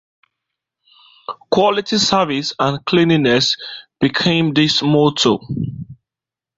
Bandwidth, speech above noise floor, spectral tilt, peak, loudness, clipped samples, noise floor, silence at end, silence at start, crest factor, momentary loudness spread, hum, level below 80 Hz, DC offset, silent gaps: 8 kHz; 72 dB; -4.5 dB/octave; 0 dBFS; -16 LUFS; under 0.1%; -88 dBFS; 0.65 s; 1.3 s; 18 dB; 18 LU; none; -52 dBFS; under 0.1%; none